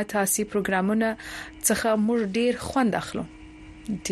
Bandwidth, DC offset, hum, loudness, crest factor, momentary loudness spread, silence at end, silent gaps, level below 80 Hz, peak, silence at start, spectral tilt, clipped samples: 13 kHz; under 0.1%; none; -25 LUFS; 18 dB; 13 LU; 0 s; none; -52 dBFS; -8 dBFS; 0 s; -4 dB/octave; under 0.1%